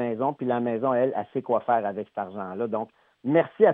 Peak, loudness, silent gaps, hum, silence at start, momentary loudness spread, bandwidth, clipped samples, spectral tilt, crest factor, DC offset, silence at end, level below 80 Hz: -6 dBFS; -26 LUFS; none; none; 0 s; 10 LU; 3.9 kHz; under 0.1%; -10.5 dB/octave; 20 dB; under 0.1%; 0 s; -82 dBFS